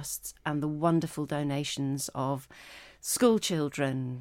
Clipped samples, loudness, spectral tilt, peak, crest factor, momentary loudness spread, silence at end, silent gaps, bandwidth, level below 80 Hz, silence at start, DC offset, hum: under 0.1%; -30 LUFS; -5 dB/octave; -10 dBFS; 20 dB; 13 LU; 0 s; none; 17 kHz; -62 dBFS; 0 s; under 0.1%; none